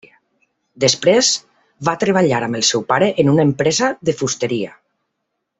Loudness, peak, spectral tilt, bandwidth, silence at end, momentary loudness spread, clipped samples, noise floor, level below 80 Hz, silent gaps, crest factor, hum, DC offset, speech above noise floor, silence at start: -16 LUFS; -2 dBFS; -4 dB/octave; 8.4 kHz; 0.9 s; 9 LU; under 0.1%; -75 dBFS; -56 dBFS; none; 16 dB; none; under 0.1%; 59 dB; 0.8 s